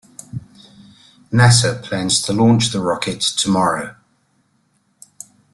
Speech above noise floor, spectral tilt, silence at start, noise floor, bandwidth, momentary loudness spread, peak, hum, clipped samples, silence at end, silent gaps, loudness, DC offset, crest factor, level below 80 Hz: 47 dB; -4 dB/octave; 0.35 s; -62 dBFS; 12 kHz; 21 LU; -2 dBFS; none; under 0.1%; 1.6 s; none; -16 LUFS; under 0.1%; 18 dB; -50 dBFS